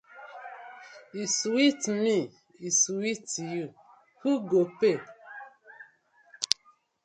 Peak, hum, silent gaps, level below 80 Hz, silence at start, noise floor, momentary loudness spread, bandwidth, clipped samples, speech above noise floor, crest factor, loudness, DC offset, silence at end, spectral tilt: 0 dBFS; none; none; -78 dBFS; 0.15 s; -64 dBFS; 21 LU; 11.5 kHz; under 0.1%; 37 dB; 30 dB; -27 LUFS; under 0.1%; 0.6 s; -3 dB/octave